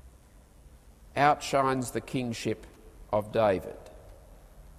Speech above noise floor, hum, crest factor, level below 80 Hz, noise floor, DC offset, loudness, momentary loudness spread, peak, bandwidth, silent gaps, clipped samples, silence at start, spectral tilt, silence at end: 27 dB; none; 22 dB; -52 dBFS; -55 dBFS; under 0.1%; -29 LUFS; 15 LU; -10 dBFS; 15.5 kHz; none; under 0.1%; 0.05 s; -5 dB/octave; 0 s